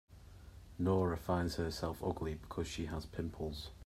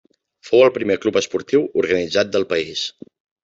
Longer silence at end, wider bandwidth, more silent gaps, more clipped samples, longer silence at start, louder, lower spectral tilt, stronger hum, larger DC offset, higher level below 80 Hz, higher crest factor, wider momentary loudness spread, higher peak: second, 0 s vs 0.55 s; first, 15.5 kHz vs 7.8 kHz; neither; neither; second, 0.1 s vs 0.45 s; second, -39 LUFS vs -19 LUFS; first, -6.5 dB/octave vs -4 dB/octave; neither; neither; first, -54 dBFS vs -62 dBFS; about the same, 18 dB vs 18 dB; first, 22 LU vs 8 LU; second, -20 dBFS vs -2 dBFS